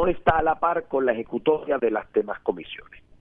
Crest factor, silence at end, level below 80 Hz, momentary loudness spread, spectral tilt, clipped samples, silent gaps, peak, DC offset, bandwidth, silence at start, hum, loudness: 20 dB; 0.25 s; -46 dBFS; 10 LU; -8.5 dB/octave; under 0.1%; none; -4 dBFS; under 0.1%; 3.9 kHz; 0 s; none; -24 LUFS